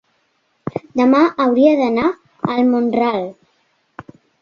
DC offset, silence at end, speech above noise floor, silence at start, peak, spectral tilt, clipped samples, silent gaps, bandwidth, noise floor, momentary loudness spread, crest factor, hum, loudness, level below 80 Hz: under 0.1%; 1.1 s; 50 dB; 0.65 s; -2 dBFS; -7.5 dB/octave; under 0.1%; none; 6.8 kHz; -64 dBFS; 15 LU; 16 dB; none; -16 LUFS; -56 dBFS